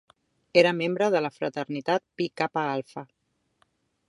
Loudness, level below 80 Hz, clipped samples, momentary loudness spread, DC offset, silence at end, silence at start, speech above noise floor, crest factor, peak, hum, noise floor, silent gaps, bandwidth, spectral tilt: -26 LUFS; -76 dBFS; under 0.1%; 12 LU; under 0.1%; 1.05 s; 0.55 s; 44 dB; 24 dB; -4 dBFS; none; -70 dBFS; none; 11.5 kHz; -5.5 dB/octave